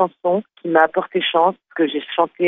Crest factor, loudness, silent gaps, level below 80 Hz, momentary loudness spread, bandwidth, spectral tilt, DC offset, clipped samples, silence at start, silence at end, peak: 18 dB; -19 LUFS; none; -70 dBFS; 5 LU; 4 kHz; -7.5 dB/octave; under 0.1%; under 0.1%; 0 s; 0 s; 0 dBFS